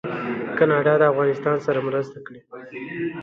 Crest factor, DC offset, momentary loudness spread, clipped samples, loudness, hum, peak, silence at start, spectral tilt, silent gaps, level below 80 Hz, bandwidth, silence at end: 18 dB; under 0.1%; 21 LU; under 0.1%; -21 LUFS; none; -4 dBFS; 0.05 s; -8 dB/octave; none; -66 dBFS; 7 kHz; 0 s